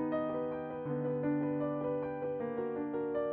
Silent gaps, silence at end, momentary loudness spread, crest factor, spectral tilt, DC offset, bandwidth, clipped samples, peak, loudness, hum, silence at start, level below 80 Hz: none; 0 s; 4 LU; 12 dB; -8 dB/octave; under 0.1%; 4 kHz; under 0.1%; -24 dBFS; -36 LUFS; none; 0 s; -68 dBFS